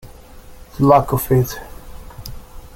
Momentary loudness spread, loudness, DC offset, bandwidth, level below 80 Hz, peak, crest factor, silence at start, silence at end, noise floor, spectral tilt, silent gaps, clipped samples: 25 LU; -16 LUFS; under 0.1%; 17 kHz; -38 dBFS; 0 dBFS; 18 dB; 0.05 s; 0 s; -39 dBFS; -7 dB/octave; none; under 0.1%